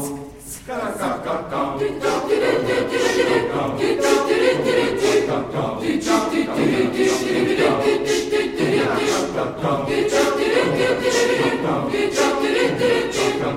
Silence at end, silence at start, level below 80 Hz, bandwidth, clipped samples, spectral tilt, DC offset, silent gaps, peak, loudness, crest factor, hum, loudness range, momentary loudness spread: 0 s; 0 s; -48 dBFS; 16.5 kHz; under 0.1%; -4.5 dB/octave; under 0.1%; none; -4 dBFS; -19 LUFS; 16 dB; none; 2 LU; 7 LU